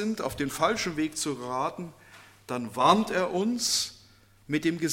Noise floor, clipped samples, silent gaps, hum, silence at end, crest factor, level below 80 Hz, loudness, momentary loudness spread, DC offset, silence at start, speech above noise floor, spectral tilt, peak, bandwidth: -57 dBFS; under 0.1%; none; none; 0 s; 24 dB; -58 dBFS; -28 LUFS; 12 LU; under 0.1%; 0 s; 30 dB; -3.5 dB/octave; -6 dBFS; 17 kHz